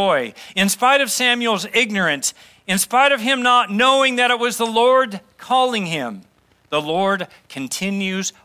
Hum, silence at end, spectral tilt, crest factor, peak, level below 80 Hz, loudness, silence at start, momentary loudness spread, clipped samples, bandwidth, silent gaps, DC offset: none; 0.15 s; -2.5 dB/octave; 16 dB; -2 dBFS; -66 dBFS; -17 LUFS; 0 s; 10 LU; under 0.1%; 16 kHz; none; under 0.1%